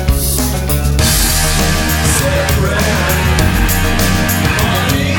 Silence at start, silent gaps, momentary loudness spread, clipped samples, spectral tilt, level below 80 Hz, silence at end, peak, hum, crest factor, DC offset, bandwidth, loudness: 0 s; none; 3 LU; under 0.1%; -4 dB/octave; -18 dBFS; 0 s; 0 dBFS; none; 12 dB; under 0.1%; 19.5 kHz; -12 LUFS